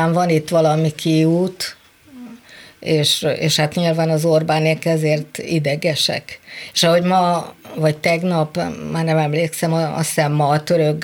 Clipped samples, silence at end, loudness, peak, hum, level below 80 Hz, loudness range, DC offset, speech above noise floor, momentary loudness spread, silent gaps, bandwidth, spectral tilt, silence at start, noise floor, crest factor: under 0.1%; 0 s; -17 LUFS; -4 dBFS; none; -58 dBFS; 2 LU; under 0.1%; 25 dB; 8 LU; none; 19 kHz; -5 dB/octave; 0 s; -42 dBFS; 14 dB